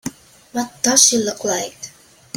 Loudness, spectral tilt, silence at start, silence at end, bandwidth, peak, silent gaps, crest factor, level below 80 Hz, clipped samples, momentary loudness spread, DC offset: -16 LUFS; -1 dB/octave; 0.05 s; 0.5 s; 17 kHz; 0 dBFS; none; 20 dB; -60 dBFS; under 0.1%; 22 LU; under 0.1%